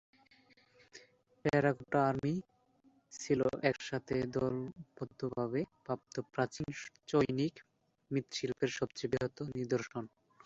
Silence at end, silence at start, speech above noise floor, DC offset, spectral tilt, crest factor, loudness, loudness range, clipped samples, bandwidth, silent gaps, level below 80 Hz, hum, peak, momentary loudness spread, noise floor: 0.4 s; 0.95 s; 34 dB; under 0.1%; -5.5 dB/octave; 22 dB; -36 LUFS; 3 LU; under 0.1%; 8 kHz; none; -66 dBFS; none; -16 dBFS; 13 LU; -70 dBFS